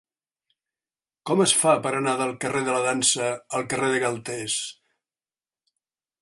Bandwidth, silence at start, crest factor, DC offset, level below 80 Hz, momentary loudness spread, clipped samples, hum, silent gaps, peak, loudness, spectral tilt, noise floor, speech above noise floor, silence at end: 11.5 kHz; 1.25 s; 22 dB; under 0.1%; -68 dBFS; 10 LU; under 0.1%; none; none; -4 dBFS; -23 LUFS; -2.5 dB/octave; under -90 dBFS; over 66 dB; 1.5 s